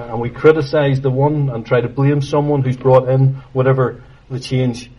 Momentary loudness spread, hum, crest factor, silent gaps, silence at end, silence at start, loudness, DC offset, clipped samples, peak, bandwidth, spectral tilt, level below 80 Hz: 8 LU; none; 16 dB; none; 0.1 s; 0 s; -15 LUFS; under 0.1%; under 0.1%; 0 dBFS; 11 kHz; -8 dB/octave; -44 dBFS